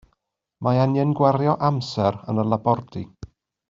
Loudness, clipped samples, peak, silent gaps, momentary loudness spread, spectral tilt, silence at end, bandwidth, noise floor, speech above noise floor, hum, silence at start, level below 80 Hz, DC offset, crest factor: -21 LUFS; under 0.1%; -4 dBFS; none; 11 LU; -7.5 dB/octave; 0.45 s; 7.6 kHz; -74 dBFS; 53 dB; none; 0.6 s; -56 dBFS; under 0.1%; 18 dB